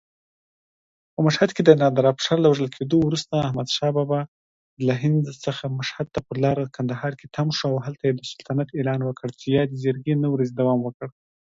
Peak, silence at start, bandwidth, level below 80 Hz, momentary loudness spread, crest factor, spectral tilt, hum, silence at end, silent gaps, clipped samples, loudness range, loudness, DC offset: 0 dBFS; 1.2 s; 7.8 kHz; -58 dBFS; 10 LU; 22 dB; -6.5 dB/octave; none; 0.45 s; 4.28-4.77 s, 10.94-11.00 s; under 0.1%; 6 LU; -23 LUFS; under 0.1%